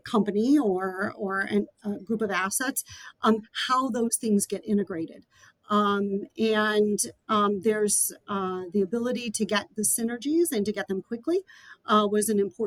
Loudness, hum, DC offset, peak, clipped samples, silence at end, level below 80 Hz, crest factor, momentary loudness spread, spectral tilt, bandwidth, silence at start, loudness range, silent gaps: -26 LUFS; none; under 0.1%; -10 dBFS; under 0.1%; 0 s; -68 dBFS; 16 dB; 8 LU; -4 dB/octave; 19 kHz; 0.05 s; 2 LU; none